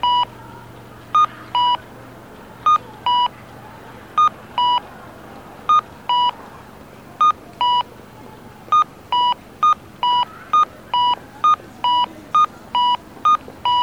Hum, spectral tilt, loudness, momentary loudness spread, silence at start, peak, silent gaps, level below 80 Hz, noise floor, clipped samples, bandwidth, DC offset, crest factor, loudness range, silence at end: none; -3 dB/octave; -18 LUFS; 21 LU; 0 s; -8 dBFS; none; -54 dBFS; -40 dBFS; under 0.1%; 17 kHz; 0.1%; 12 dB; 2 LU; 0 s